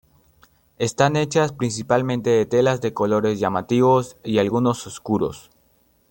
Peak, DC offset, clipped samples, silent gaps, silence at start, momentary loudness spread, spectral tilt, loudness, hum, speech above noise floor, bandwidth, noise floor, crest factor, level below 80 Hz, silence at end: -2 dBFS; under 0.1%; under 0.1%; none; 0.8 s; 8 LU; -6 dB/octave; -21 LUFS; none; 41 dB; 17 kHz; -61 dBFS; 20 dB; -56 dBFS; 0.7 s